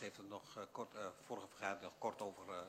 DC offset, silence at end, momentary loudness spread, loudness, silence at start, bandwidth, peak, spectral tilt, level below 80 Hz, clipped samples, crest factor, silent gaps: under 0.1%; 0 s; 6 LU; -49 LUFS; 0 s; 16 kHz; -30 dBFS; -4 dB/octave; -88 dBFS; under 0.1%; 20 dB; none